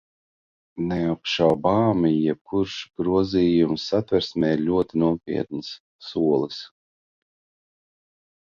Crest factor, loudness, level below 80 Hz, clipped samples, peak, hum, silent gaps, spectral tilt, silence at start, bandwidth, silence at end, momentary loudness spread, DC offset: 20 dB; -23 LUFS; -52 dBFS; under 0.1%; -4 dBFS; none; 2.41-2.45 s, 5.80-5.99 s; -7 dB/octave; 0.75 s; 7.2 kHz; 1.8 s; 12 LU; under 0.1%